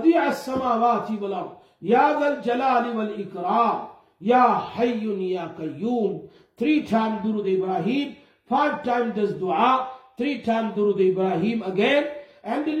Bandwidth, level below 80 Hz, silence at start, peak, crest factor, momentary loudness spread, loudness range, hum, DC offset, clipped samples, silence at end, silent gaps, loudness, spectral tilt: 13.5 kHz; -66 dBFS; 0 s; -6 dBFS; 16 dB; 10 LU; 3 LU; none; under 0.1%; under 0.1%; 0 s; none; -23 LUFS; -6.5 dB/octave